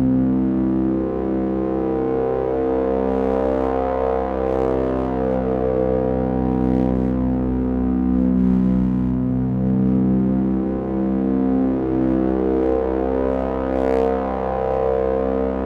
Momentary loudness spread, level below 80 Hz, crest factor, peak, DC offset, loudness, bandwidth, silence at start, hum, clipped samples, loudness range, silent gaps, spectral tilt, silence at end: 4 LU; -32 dBFS; 12 dB; -6 dBFS; under 0.1%; -20 LUFS; 4.8 kHz; 0 s; none; under 0.1%; 1 LU; none; -11 dB/octave; 0 s